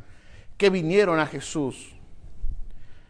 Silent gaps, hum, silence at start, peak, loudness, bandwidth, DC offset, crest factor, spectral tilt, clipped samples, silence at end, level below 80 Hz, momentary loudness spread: none; none; 0.05 s; -8 dBFS; -23 LUFS; 10.5 kHz; under 0.1%; 18 dB; -5.5 dB/octave; under 0.1%; 0.1 s; -38 dBFS; 21 LU